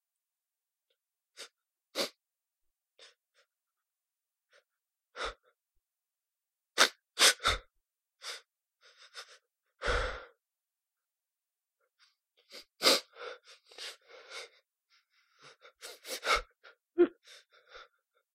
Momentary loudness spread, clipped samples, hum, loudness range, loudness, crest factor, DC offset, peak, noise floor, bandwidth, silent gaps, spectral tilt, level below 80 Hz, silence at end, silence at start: 25 LU; under 0.1%; none; 18 LU; -30 LUFS; 30 dB; under 0.1%; -8 dBFS; under -90 dBFS; 16 kHz; none; -1.5 dB/octave; -54 dBFS; 0.5 s; 1.4 s